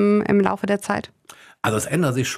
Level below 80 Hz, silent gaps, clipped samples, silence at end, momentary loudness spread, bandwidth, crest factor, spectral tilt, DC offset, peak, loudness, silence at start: -56 dBFS; none; under 0.1%; 0 s; 9 LU; 15.5 kHz; 18 dB; -5.5 dB/octave; under 0.1%; -4 dBFS; -21 LUFS; 0 s